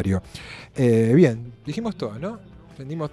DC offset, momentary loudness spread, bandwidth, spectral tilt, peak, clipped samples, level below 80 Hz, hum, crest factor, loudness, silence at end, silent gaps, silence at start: under 0.1%; 21 LU; 12.5 kHz; -8 dB/octave; -4 dBFS; under 0.1%; -50 dBFS; none; 18 dB; -22 LUFS; 0 s; none; 0 s